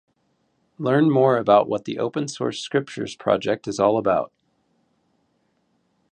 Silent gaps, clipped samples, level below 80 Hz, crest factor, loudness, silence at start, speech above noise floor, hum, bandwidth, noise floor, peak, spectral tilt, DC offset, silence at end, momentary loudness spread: none; under 0.1%; -62 dBFS; 20 dB; -21 LUFS; 0.8 s; 48 dB; none; 9.8 kHz; -68 dBFS; -4 dBFS; -6 dB/octave; under 0.1%; 1.85 s; 10 LU